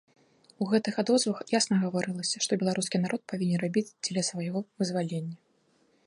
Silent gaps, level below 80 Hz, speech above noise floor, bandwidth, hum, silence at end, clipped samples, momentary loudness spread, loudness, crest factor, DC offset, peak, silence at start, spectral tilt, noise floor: none; -74 dBFS; 39 dB; 11.5 kHz; none; 0.7 s; under 0.1%; 8 LU; -29 LUFS; 18 dB; under 0.1%; -12 dBFS; 0.6 s; -4.5 dB/octave; -68 dBFS